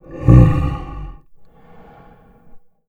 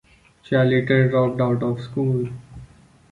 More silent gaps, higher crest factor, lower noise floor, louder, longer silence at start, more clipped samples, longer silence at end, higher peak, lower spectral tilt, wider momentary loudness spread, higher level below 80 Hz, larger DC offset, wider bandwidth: neither; about the same, 16 dB vs 16 dB; about the same, -46 dBFS vs -47 dBFS; first, -13 LUFS vs -21 LUFS; second, 0.1 s vs 0.5 s; neither; second, 0.3 s vs 0.45 s; first, 0 dBFS vs -4 dBFS; about the same, -10 dB/octave vs -9 dB/octave; first, 24 LU vs 8 LU; first, -24 dBFS vs -52 dBFS; neither; second, 3.9 kHz vs 4.7 kHz